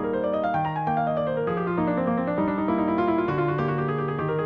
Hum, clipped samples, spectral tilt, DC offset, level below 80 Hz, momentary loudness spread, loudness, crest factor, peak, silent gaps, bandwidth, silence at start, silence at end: none; under 0.1%; -10 dB/octave; under 0.1%; -52 dBFS; 3 LU; -25 LUFS; 14 dB; -12 dBFS; none; 5.4 kHz; 0 s; 0 s